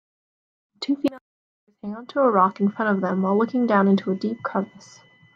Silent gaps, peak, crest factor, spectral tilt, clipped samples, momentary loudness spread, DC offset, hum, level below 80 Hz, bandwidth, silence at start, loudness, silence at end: 1.21-1.67 s; -6 dBFS; 18 dB; -7.5 dB/octave; under 0.1%; 15 LU; under 0.1%; none; -74 dBFS; 7.4 kHz; 0.8 s; -22 LUFS; 0.55 s